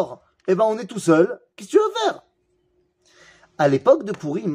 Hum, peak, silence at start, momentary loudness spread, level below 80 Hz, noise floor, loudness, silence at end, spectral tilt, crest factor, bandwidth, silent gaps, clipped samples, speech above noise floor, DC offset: none; -2 dBFS; 0 s; 12 LU; -70 dBFS; -66 dBFS; -20 LUFS; 0 s; -6 dB/octave; 18 dB; 15 kHz; none; under 0.1%; 47 dB; under 0.1%